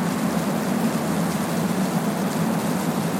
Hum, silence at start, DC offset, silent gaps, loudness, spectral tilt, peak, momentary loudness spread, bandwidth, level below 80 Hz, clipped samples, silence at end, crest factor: none; 0 s; under 0.1%; none; -23 LUFS; -5.5 dB/octave; -10 dBFS; 1 LU; 16.5 kHz; -58 dBFS; under 0.1%; 0 s; 12 dB